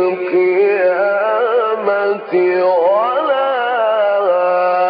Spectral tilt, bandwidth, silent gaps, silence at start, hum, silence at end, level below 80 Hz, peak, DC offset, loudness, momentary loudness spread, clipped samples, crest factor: -8 dB/octave; 5.2 kHz; none; 0 s; none; 0 s; -80 dBFS; -4 dBFS; under 0.1%; -14 LUFS; 3 LU; under 0.1%; 10 dB